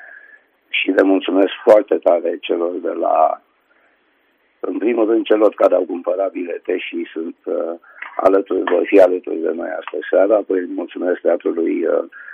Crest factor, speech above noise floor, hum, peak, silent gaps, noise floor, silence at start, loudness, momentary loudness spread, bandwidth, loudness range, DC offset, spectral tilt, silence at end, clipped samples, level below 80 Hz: 18 dB; 44 dB; none; 0 dBFS; none; -60 dBFS; 0 s; -17 LUFS; 13 LU; 6.6 kHz; 3 LU; under 0.1%; -5.5 dB/octave; 0 s; under 0.1%; -66 dBFS